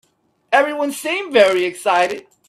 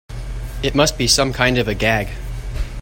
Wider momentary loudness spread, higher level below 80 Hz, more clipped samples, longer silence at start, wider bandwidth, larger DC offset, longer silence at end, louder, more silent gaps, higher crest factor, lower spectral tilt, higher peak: second, 8 LU vs 16 LU; second, -66 dBFS vs -28 dBFS; neither; first, 0.5 s vs 0.1 s; about the same, 15 kHz vs 16.5 kHz; neither; first, 0.3 s vs 0 s; about the same, -17 LUFS vs -17 LUFS; neither; about the same, 18 dB vs 18 dB; about the same, -2.5 dB/octave vs -3.5 dB/octave; about the same, 0 dBFS vs 0 dBFS